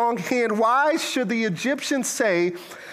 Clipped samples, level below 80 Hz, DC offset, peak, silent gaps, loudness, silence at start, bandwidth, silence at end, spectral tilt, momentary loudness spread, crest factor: under 0.1%; -74 dBFS; under 0.1%; -8 dBFS; none; -22 LUFS; 0 s; 15.5 kHz; 0 s; -3.5 dB/octave; 5 LU; 14 dB